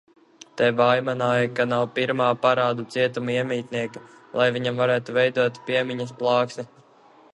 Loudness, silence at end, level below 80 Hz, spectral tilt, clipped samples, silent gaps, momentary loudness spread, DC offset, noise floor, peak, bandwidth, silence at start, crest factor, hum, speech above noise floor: -23 LUFS; 0.7 s; -68 dBFS; -6 dB/octave; under 0.1%; none; 10 LU; under 0.1%; -53 dBFS; -4 dBFS; 11 kHz; 0.55 s; 18 dB; none; 31 dB